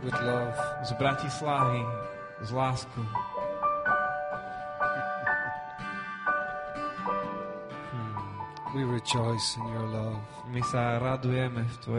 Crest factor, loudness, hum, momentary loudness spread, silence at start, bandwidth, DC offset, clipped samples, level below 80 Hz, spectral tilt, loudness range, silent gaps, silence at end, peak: 16 dB; -31 LUFS; none; 10 LU; 0 s; 10.5 kHz; under 0.1%; under 0.1%; -58 dBFS; -5 dB/octave; 3 LU; none; 0 s; -14 dBFS